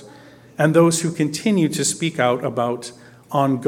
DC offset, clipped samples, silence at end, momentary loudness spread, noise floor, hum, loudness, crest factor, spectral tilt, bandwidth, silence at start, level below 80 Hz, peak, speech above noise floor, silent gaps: under 0.1%; under 0.1%; 0 s; 10 LU; -45 dBFS; none; -19 LUFS; 18 dB; -5 dB/octave; 16.5 kHz; 0 s; -62 dBFS; -2 dBFS; 26 dB; none